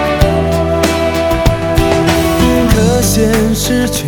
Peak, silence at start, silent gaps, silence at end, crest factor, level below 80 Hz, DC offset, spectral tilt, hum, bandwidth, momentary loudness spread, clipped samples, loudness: 0 dBFS; 0 s; none; 0 s; 12 dB; -20 dBFS; under 0.1%; -5 dB/octave; none; over 20 kHz; 3 LU; under 0.1%; -12 LUFS